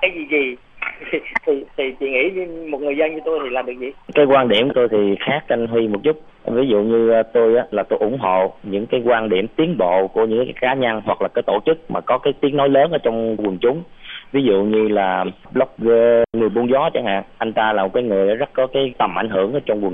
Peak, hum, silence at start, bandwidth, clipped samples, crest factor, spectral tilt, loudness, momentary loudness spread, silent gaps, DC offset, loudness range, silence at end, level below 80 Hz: -2 dBFS; none; 0 s; 3.8 kHz; under 0.1%; 16 dB; -8.5 dB/octave; -18 LUFS; 8 LU; none; under 0.1%; 2 LU; 0 s; -50 dBFS